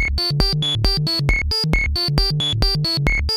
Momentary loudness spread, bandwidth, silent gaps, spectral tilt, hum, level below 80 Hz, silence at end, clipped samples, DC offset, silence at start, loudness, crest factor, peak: 1 LU; 16 kHz; none; -4.5 dB/octave; none; -24 dBFS; 0 s; under 0.1%; under 0.1%; 0 s; -18 LUFS; 18 dB; 0 dBFS